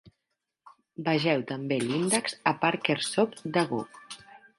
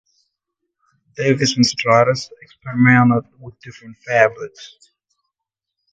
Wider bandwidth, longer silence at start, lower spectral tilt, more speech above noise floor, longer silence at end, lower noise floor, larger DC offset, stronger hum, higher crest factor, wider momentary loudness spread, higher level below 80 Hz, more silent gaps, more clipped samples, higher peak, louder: first, 12 kHz vs 8.8 kHz; second, 0.05 s vs 1.2 s; about the same, -4 dB/octave vs -5 dB/octave; second, 55 dB vs 65 dB; second, 0.2 s vs 1.25 s; about the same, -83 dBFS vs -82 dBFS; neither; neither; about the same, 22 dB vs 18 dB; second, 17 LU vs 24 LU; second, -72 dBFS vs -58 dBFS; neither; neither; second, -8 dBFS vs 0 dBFS; second, -28 LUFS vs -16 LUFS